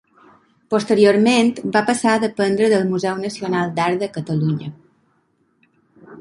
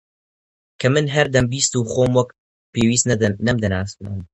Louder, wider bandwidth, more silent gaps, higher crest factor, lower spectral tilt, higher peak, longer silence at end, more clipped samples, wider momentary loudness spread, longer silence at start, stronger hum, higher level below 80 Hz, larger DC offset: about the same, -18 LUFS vs -19 LUFS; about the same, 11.5 kHz vs 10.5 kHz; second, none vs 2.38-2.73 s; about the same, 18 dB vs 20 dB; about the same, -5.5 dB/octave vs -4.5 dB/octave; about the same, -2 dBFS vs 0 dBFS; about the same, 0 s vs 0.1 s; neither; about the same, 9 LU vs 11 LU; about the same, 0.7 s vs 0.8 s; neither; second, -62 dBFS vs -42 dBFS; neither